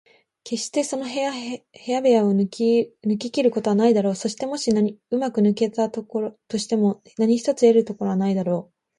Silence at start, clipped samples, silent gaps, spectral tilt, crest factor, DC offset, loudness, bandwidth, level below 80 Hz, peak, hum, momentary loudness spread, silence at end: 0.45 s; under 0.1%; none; -6 dB/octave; 16 dB; under 0.1%; -22 LUFS; 11.5 kHz; -68 dBFS; -4 dBFS; none; 10 LU; 0.35 s